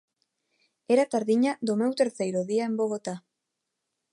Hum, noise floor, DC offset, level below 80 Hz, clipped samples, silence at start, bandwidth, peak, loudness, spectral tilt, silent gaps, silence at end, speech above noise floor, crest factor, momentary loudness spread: none; -83 dBFS; under 0.1%; -80 dBFS; under 0.1%; 0.9 s; 11.5 kHz; -10 dBFS; -26 LUFS; -5.5 dB/octave; none; 0.95 s; 58 dB; 18 dB; 8 LU